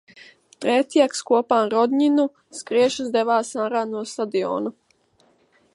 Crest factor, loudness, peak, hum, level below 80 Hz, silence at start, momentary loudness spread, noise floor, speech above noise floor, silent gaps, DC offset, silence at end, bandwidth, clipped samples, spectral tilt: 18 dB; -21 LUFS; -4 dBFS; none; -72 dBFS; 0.15 s; 9 LU; -61 dBFS; 41 dB; none; under 0.1%; 1.05 s; 11.5 kHz; under 0.1%; -4 dB/octave